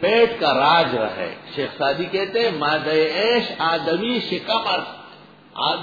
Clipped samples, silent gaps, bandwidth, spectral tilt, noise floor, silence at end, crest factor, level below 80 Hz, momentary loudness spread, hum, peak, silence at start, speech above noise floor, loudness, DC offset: under 0.1%; none; 5 kHz; -5.5 dB/octave; -45 dBFS; 0 s; 18 dB; -60 dBFS; 11 LU; none; -4 dBFS; 0 s; 25 dB; -20 LUFS; under 0.1%